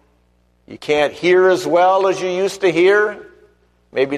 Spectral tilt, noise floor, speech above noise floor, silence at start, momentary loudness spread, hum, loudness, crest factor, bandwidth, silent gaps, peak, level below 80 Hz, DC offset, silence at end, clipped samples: -4.5 dB/octave; -58 dBFS; 43 dB; 0.7 s; 10 LU; 60 Hz at -50 dBFS; -15 LUFS; 14 dB; 13 kHz; none; -4 dBFS; -58 dBFS; under 0.1%; 0 s; under 0.1%